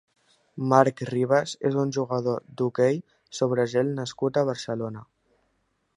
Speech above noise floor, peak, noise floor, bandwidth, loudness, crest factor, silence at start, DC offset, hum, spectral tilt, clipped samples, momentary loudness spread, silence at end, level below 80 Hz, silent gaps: 48 dB; -2 dBFS; -72 dBFS; 11 kHz; -25 LUFS; 24 dB; 0.55 s; under 0.1%; none; -6 dB/octave; under 0.1%; 11 LU; 0.95 s; -68 dBFS; none